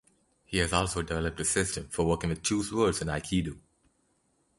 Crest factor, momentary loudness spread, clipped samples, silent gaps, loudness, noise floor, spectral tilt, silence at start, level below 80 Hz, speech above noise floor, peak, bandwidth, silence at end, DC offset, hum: 22 dB; 5 LU; under 0.1%; none; -29 LUFS; -72 dBFS; -4 dB/octave; 0.5 s; -46 dBFS; 42 dB; -8 dBFS; 11.5 kHz; 1 s; under 0.1%; none